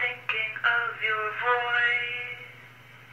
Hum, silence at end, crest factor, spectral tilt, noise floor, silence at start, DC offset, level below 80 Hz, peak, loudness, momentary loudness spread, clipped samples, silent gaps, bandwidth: none; 0 s; 18 dB; -3 dB/octave; -50 dBFS; 0 s; under 0.1%; -76 dBFS; -10 dBFS; -26 LUFS; 12 LU; under 0.1%; none; 16 kHz